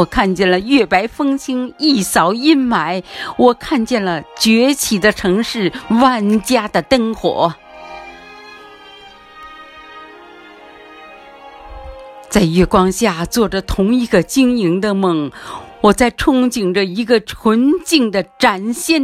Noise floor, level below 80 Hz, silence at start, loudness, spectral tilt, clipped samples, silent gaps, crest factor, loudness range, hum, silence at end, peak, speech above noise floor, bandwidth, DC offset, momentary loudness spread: -39 dBFS; -38 dBFS; 0 s; -14 LUFS; -4.5 dB/octave; under 0.1%; none; 16 dB; 7 LU; none; 0 s; 0 dBFS; 25 dB; 15.5 kHz; under 0.1%; 22 LU